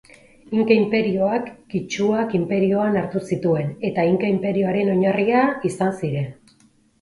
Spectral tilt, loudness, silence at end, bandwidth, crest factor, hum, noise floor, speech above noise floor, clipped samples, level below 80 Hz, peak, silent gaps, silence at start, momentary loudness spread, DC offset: -7 dB/octave; -21 LUFS; 0.7 s; 11.5 kHz; 18 dB; none; -57 dBFS; 37 dB; under 0.1%; -58 dBFS; -2 dBFS; none; 0.5 s; 8 LU; under 0.1%